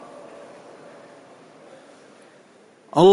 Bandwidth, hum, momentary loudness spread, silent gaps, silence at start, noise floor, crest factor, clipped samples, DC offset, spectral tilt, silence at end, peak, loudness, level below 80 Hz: 10.5 kHz; none; 20 LU; none; 2.95 s; -52 dBFS; 20 dB; under 0.1%; under 0.1%; -7 dB/octave; 0 s; -4 dBFS; -19 LUFS; -64 dBFS